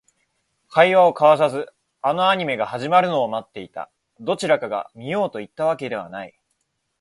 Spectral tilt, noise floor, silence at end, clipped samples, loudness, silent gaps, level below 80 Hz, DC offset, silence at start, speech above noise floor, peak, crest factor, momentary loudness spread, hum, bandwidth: -5 dB/octave; -73 dBFS; 0.7 s; under 0.1%; -20 LUFS; none; -66 dBFS; under 0.1%; 0.7 s; 53 dB; 0 dBFS; 20 dB; 20 LU; none; 11.5 kHz